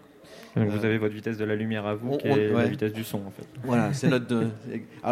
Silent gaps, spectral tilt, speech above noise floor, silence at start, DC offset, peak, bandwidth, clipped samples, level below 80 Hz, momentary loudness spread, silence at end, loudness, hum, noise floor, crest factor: none; -7 dB/octave; 22 dB; 0.25 s; under 0.1%; -8 dBFS; 16 kHz; under 0.1%; -64 dBFS; 12 LU; 0 s; -27 LUFS; none; -48 dBFS; 18 dB